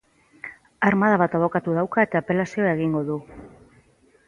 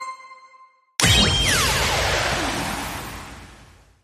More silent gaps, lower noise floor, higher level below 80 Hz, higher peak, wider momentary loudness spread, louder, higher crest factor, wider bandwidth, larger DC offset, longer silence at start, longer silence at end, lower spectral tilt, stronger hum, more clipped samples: neither; first, -58 dBFS vs -52 dBFS; second, -58 dBFS vs -34 dBFS; about the same, -4 dBFS vs -2 dBFS; about the same, 20 LU vs 20 LU; second, -22 LUFS vs -19 LUFS; about the same, 18 dB vs 22 dB; second, 10 kHz vs 15.5 kHz; neither; first, 0.45 s vs 0 s; first, 0.8 s vs 0.4 s; first, -8 dB/octave vs -2.5 dB/octave; neither; neither